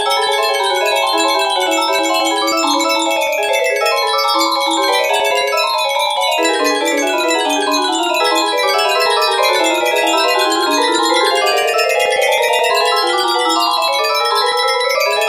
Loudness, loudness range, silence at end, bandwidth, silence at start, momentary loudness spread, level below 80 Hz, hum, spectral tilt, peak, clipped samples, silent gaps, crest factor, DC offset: -14 LUFS; 1 LU; 0 s; 16 kHz; 0 s; 2 LU; -64 dBFS; none; 0.5 dB/octave; -2 dBFS; under 0.1%; none; 14 dB; under 0.1%